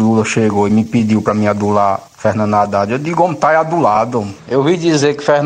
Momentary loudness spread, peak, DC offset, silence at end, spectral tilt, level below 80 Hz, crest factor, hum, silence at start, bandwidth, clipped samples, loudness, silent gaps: 4 LU; 0 dBFS; under 0.1%; 0 s; -6 dB/octave; -52 dBFS; 12 dB; none; 0 s; 9.8 kHz; under 0.1%; -14 LUFS; none